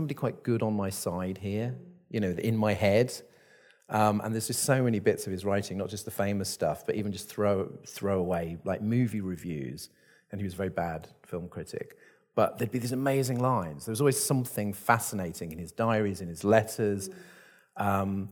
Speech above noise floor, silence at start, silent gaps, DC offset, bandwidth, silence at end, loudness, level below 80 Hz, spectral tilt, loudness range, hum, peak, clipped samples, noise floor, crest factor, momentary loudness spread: 31 dB; 0 s; none; under 0.1%; 19 kHz; 0 s; -30 LUFS; -62 dBFS; -5.5 dB/octave; 6 LU; none; -8 dBFS; under 0.1%; -60 dBFS; 22 dB; 14 LU